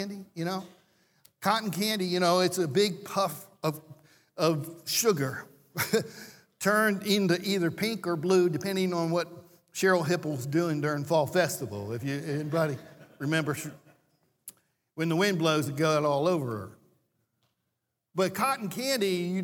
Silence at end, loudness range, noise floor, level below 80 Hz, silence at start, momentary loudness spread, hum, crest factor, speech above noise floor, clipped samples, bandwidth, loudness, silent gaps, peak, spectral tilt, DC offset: 0 s; 4 LU; -82 dBFS; -76 dBFS; 0 s; 14 LU; none; 20 dB; 54 dB; under 0.1%; 19 kHz; -28 LUFS; none; -10 dBFS; -4.5 dB/octave; under 0.1%